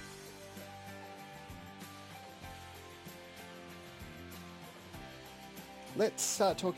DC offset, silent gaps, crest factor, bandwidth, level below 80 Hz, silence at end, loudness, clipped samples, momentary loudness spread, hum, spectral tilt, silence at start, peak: under 0.1%; none; 24 dB; 16.5 kHz; -66 dBFS; 0 s; -41 LUFS; under 0.1%; 18 LU; none; -3 dB/octave; 0 s; -18 dBFS